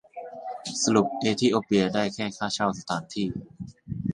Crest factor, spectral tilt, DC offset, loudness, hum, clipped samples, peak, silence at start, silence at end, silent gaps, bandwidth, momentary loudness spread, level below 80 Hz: 20 dB; -4.5 dB/octave; under 0.1%; -26 LUFS; none; under 0.1%; -6 dBFS; 0.15 s; 0 s; none; 11.5 kHz; 15 LU; -56 dBFS